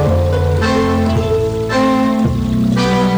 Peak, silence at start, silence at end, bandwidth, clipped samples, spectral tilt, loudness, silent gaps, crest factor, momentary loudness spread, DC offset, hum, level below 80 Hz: -4 dBFS; 0 s; 0 s; over 20 kHz; under 0.1%; -7 dB/octave; -15 LUFS; none; 10 dB; 2 LU; under 0.1%; none; -28 dBFS